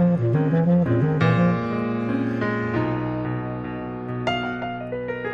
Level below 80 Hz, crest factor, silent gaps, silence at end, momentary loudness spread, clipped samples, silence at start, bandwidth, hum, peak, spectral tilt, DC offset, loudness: -50 dBFS; 14 dB; none; 0 s; 10 LU; under 0.1%; 0 s; 7 kHz; none; -8 dBFS; -9 dB/octave; under 0.1%; -23 LUFS